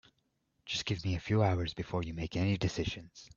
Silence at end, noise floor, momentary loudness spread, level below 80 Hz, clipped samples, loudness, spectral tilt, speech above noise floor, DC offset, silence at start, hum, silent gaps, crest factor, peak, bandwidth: 0.1 s; -78 dBFS; 8 LU; -54 dBFS; under 0.1%; -34 LUFS; -6 dB/octave; 44 dB; under 0.1%; 0.65 s; none; none; 20 dB; -14 dBFS; 7.4 kHz